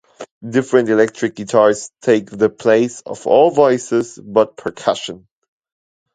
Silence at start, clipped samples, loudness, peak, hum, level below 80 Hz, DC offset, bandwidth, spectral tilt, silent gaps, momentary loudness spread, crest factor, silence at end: 0.2 s; under 0.1%; -16 LUFS; 0 dBFS; none; -60 dBFS; under 0.1%; 9.4 kHz; -5 dB/octave; 0.31-0.41 s; 9 LU; 16 dB; 0.95 s